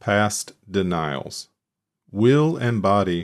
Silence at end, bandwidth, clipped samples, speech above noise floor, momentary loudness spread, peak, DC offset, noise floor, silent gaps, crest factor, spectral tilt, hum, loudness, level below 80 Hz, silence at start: 0 s; 14.5 kHz; under 0.1%; 63 dB; 15 LU; -6 dBFS; under 0.1%; -83 dBFS; none; 16 dB; -5.5 dB/octave; none; -21 LUFS; -56 dBFS; 0.05 s